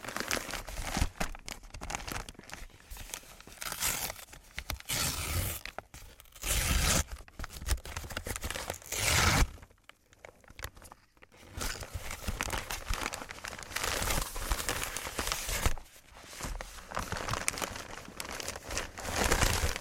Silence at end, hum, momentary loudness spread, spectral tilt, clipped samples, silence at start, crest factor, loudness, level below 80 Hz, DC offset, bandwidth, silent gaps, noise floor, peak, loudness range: 0 s; none; 19 LU; -2.5 dB/octave; under 0.1%; 0 s; 28 dB; -34 LUFS; -40 dBFS; under 0.1%; 17 kHz; none; -60 dBFS; -6 dBFS; 6 LU